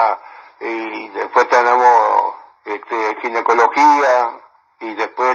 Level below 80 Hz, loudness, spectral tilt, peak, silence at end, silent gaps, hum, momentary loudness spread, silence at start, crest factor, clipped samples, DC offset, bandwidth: -72 dBFS; -15 LUFS; -2.5 dB/octave; 0 dBFS; 0 s; none; none; 17 LU; 0 s; 16 dB; under 0.1%; under 0.1%; 7.4 kHz